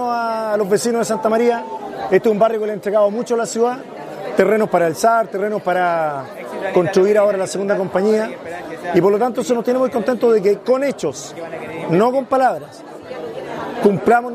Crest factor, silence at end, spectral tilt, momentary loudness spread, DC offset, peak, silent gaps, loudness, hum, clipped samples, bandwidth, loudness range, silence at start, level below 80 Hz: 18 dB; 0 s; -5.5 dB/octave; 14 LU; under 0.1%; 0 dBFS; none; -17 LUFS; none; under 0.1%; 15 kHz; 1 LU; 0 s; -60 dBFS